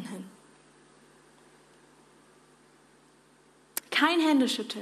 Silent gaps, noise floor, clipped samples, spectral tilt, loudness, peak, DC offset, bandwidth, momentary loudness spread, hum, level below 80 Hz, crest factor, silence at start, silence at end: none; -61 dBFS; under 0.1%; -3 dB/octave; -26 LUFS; -8 dBFS; under 0.1%; 15 kHz; 20 LU; none; -80 dBFS; 24 dB; 0 s; 0 s